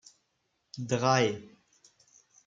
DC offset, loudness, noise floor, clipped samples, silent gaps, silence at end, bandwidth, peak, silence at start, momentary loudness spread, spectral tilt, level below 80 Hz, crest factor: under 0.1%; -28 LUFS; -78 dBFS; under 0.1%; none; 1 s; 7.8 kHz; -10 dBFS; 0.75 s; 18 LU; -4.5 dB/octave; -72 dBFS; 22 dB